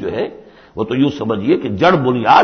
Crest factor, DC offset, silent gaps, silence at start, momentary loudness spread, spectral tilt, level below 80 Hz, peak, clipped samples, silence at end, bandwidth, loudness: 14 dB; under 0.1%; none; 0 s; 13 LU; -7 dB/octave; -46 dBFS; 0 dBFS; under 0.1%; 0 s; 6.6 kHz; -16 LUFS